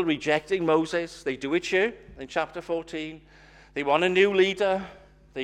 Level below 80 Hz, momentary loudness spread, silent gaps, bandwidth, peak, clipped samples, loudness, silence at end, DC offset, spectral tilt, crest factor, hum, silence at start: -58 dBFS; 15 LU; none; 10.5 kHz; -8 dBFS; under 0.1%; -25 LUFS; 0 s; under 0.1%; -5 dB/octave; 18 dB; 50 Hz at -55 dBFS; 0 s